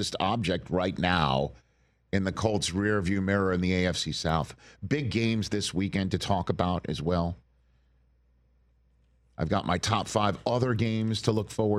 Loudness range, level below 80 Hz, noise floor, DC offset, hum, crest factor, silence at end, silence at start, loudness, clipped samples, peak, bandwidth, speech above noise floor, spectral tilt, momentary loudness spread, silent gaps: 5 LU; -50 dBFS; -65 dBFS; under 0.1%; none; 20 dB; 0 s; 0 s; -28 LUFS; under 0.1%; -10 dBFS; 13.5 kHz; 38 dB; -5.5 dB/octave; 5 LU; none